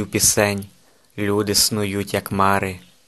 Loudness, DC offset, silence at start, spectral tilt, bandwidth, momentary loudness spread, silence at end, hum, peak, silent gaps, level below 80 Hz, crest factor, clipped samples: -19 LUFS; 0.1%; 0 s; -3 dB/octave; 13 kHz; 13 LU; 0.3 s; none; 0 dBFS; none; -48 dBFS; 20 dB; under 0.1%